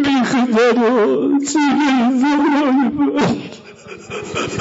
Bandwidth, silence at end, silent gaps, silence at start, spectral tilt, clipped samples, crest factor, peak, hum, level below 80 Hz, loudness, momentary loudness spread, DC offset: 8 kHz; 0 s; none; 0 s; -5 dB/octave; under 0.1%; 10 dB; -6 dBFS; none; -52 dBFS; -15 LUFS; 14 LU; under 0.1%